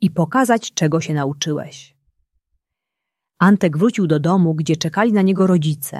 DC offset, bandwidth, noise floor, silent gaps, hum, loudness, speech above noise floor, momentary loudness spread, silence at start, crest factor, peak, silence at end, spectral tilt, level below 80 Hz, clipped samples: under 0.1%; 13.5 kHz; -82 dBFS; none; none; -17 LUFS; 65 dB; 7 LU; 0 s; 16 dB; -2 dBFS; 0 s; -6 dB/octave; -60 dBFS; under 0.1%